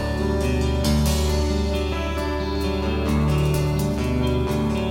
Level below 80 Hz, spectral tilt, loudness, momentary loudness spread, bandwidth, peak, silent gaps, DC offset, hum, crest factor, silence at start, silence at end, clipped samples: -26 dBFS; -6 dB/octave; -22 LUFS; 4 LU; 16.5 kHz; -8 dBFS; none; under 0.1%; none; 12 dB; 0 s; 0 s; under 0.1%